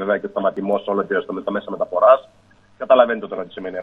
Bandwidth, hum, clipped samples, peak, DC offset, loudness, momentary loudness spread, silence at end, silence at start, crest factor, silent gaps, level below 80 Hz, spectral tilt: 3.9 kHz; none; under 0.1%; 0 dBFS; under 0.1%; -19 LUFS; 14 LU; 0 s; 0 s; 20 dB; none; -64 dBFS; -7.5 dB/octave